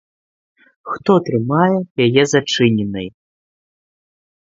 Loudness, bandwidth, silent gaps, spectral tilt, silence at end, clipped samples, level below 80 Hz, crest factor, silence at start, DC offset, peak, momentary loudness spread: -16 LUFS; 8 kHz; 1.91-1.95 s; -5.5 dB/octave; 1.35 s; under 0.1%; -54 dBFS; 18 dB; 0.85 s; under 0.1%; 0 dBFS; 12 LU